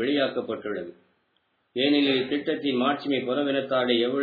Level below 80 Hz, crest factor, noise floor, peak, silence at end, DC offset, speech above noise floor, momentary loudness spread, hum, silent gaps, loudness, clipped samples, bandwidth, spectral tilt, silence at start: -74 dBFS; 16 dB; -71 dBFS; -10 dBFS; 0 s; under 0.1%; 46 dB; 11 LU; none; none; -25 LUFS; under 0.1%; 4.9 kHz; -7.5 dB/octave; 0 s